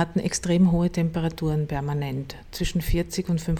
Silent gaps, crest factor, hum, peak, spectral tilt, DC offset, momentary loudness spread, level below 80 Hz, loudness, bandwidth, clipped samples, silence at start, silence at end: none; 14 dB; none; -10 dBFS; -6 dB/octave; under 0.1%; 10 LU; -36 dBFS; -25 LUFS; 18 kHz; under 0.1%; 0 s; 0 s